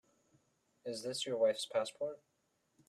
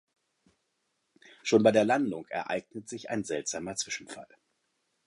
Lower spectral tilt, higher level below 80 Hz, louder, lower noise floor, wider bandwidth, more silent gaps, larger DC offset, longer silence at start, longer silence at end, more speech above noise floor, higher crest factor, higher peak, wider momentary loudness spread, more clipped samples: about the same, -3 dB/octave vs -4 dB/octave; second, -86 dBFS vs -72 dBFS; second, -37 LUFS vs -29 LUFS; about the same, -75 dBFS vs -78 dBFS; first, 13.5 kHz vs 11.5 kHz; neither; neither; second, 0.85 s vs 1.45 s; about the same, 0.75 s vs 0.8 s; second, 38 dB vs 49 dB; second, 18 dB vs 24 dB; second, -22 dBFS vs -8 dBFS; second, 14 LU vs 18 LU; neither